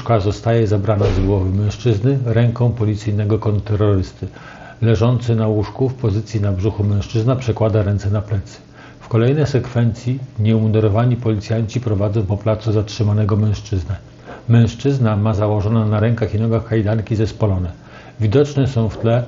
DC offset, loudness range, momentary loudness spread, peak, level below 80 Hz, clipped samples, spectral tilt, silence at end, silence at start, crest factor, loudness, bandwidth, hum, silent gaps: under 0.1%; 2 LU; 7 LU; 0 dBFS; -38 dBFS; under 0.1%; -8 dB/octave; 0 s; 0 s; 16 dB; -18 LUFS; 7.4 kHz; none; none